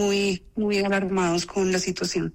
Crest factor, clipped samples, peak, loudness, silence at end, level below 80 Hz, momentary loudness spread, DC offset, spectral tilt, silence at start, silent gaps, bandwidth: 10 dB; under 0.1%; -14 dBFS; -24 LUFS; 0.05 s; -50 dBFS; 4 LU; under 0.1%; -4.5 dB/octave; 0 s; none; 16 kHz